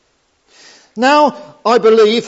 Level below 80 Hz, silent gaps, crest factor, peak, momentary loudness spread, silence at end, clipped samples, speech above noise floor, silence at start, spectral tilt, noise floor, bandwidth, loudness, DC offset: -70 dBFS; none; 14 dB; 0 dBFS; 10 LU; 0 s; under 0.1%; 48 dB; 0.95 s; -4 dB/octave; -59 dBFS; 8 kHz; -12 LUFS; under 0.1%